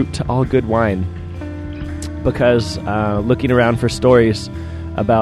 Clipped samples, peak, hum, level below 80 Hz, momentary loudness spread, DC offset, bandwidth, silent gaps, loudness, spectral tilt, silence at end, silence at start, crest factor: under 0.1%; 0 dBFS; none; -32 dBFS; 15 LU; under 0.1%; 12.5 kHz; none; -17 LUFS; -7 dB/octave; 0 s; 0 s; 16 dB